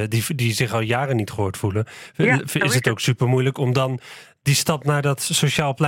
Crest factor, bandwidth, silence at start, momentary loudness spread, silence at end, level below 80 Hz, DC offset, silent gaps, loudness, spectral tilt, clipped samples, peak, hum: 16 dB; 17 kHz; 0 s; 7 LU; 0 s; -56 dBFS; under 0.1%; none; -21 LUFS; -4.5 dB/octave; under 0.1%; -6 dBFS; none